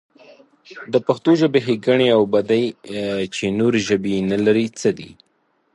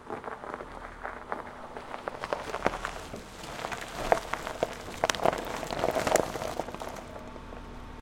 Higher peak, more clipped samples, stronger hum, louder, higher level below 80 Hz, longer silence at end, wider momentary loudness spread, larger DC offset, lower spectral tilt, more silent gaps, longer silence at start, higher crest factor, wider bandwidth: about the same, -2 dBFS vs -2 dBFS; neither; neither; first, -19 LUFS vs -33 LUFS; second, -56 dBFS vs -50 dBFS; first, 0.65 s vs 0 s; second, 9 LU vs 15 LU; neither; first, -5.5 dB/octave vs -3.5 dB/octave; neither; first, 0.7 s vs 0 s; second, 16 dB vs 32 dB; second, 11.5 kHz vs 17 kHz